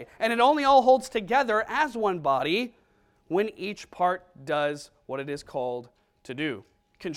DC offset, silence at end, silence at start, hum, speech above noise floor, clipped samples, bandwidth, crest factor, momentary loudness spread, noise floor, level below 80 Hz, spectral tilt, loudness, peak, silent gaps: under 0.1%; 0 s; 0 s; none; 39 dB; under 0.1%; 15 kHz; 18 dB; 17 LU; -65 dBFS; -62 dBFS; -4.5 dB/octave; -26 LUFS; -8 dBFS; none